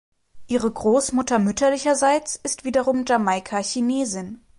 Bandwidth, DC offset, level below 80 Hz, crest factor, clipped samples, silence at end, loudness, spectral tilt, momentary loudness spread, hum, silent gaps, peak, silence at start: 11.5 kHz; under 0.1%; -54 dBFS; 14 dB; under 0.1%; 0.25 s; -21 LUFS; -4 dB/octave; 7 LU; none; none; -8 dBFS; 0.35 s